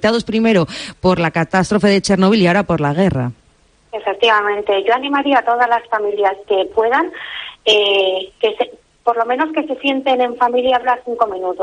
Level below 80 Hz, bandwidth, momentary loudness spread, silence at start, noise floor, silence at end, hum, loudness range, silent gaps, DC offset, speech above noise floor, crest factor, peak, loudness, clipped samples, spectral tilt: -48 dBFS; 10 kHz; 9 LU; 0 s; -53 dBFS; 0 s; none; 2 LU; none; under 0.1%; 38 dB; 14 dB; -2 dBFS; -16 LUFS; under 0.1%; -5.5 dB/octave